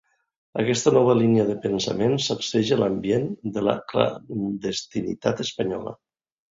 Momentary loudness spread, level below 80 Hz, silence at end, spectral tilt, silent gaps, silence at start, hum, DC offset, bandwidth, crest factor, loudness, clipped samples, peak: 10 LU; -58 dBFS; 0.55 s; -5.5 dB/octave; none; 0.55 s; none; under 0.1%; 7.8 kHz; 20 dB; -23 LUFS; under 0.1%; -4 dBFS